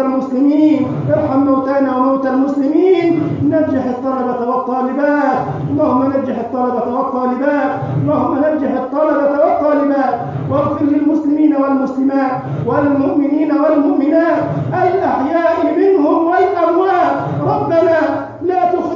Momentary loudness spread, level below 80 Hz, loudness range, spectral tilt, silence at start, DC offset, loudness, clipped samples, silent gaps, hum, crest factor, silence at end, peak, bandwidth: 5 LU; -48 dBFS; 3 LU; -9 dB/octave; 0 s; under 0.1%; -14 LUFS; under 0.1%; none; none; 12 dB; 0 s; -2 dBFS; 7 kHz